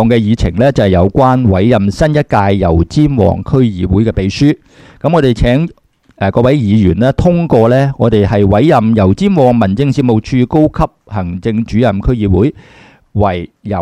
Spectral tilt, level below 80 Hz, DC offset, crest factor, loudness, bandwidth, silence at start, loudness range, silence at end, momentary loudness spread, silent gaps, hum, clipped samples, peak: -8 dB/octave; -26 dBFS; under 0.1%; 10 dB; -11 LUFS; 10.5 kHz; 0 s; 3 LU; 0 s; 7 LU; none; none; 0.1%; 0 dBFS